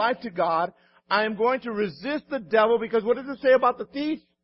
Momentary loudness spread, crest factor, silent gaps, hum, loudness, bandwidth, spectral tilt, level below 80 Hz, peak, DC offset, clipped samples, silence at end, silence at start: 9 LU; 18 dB; none; none; -24 LUFS; 5.8 kHz; -9 dB/octave; -66 dBFS; -6 dBFS; under 0.1%; under 0.1%; 0.25 s; 0 s